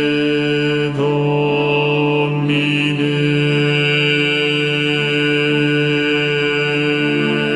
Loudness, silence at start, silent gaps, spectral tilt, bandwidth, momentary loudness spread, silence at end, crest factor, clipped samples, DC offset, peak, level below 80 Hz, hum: -15 LUFS; 0 s; none; -6.5 dB/octave; 11 kHz; 2 LU; 0 s; 12 dB; under 0.1%; 0.1%; -4 dBFS; -54 dBFS; none